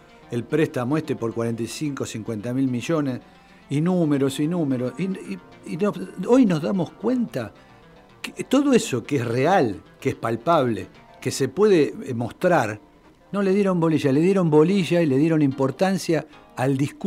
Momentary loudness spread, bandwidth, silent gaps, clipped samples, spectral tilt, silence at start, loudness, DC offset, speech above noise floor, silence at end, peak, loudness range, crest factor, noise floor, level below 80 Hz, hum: 13 LU; 15.5 kHz; none; under 0.1%; -6.5 dB/octave; 0.3 s; -22 LUFS; under 0.1%; 28 dB; 0 s; -4 dBFS; 5 LU; 18 dB; -49 dBFS; -60 dBFS; none